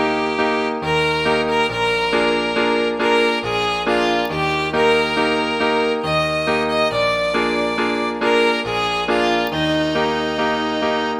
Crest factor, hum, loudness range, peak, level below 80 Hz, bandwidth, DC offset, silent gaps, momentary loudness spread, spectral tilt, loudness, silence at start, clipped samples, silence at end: 14 dB; none; 1 LU; -6 dBFS; -44 dBFS; 14.5 kHz; under 0.1%; none; 3 LU; -4.5 dB/octave; -18 LUFS; 0 s; under 0.1%; 0 s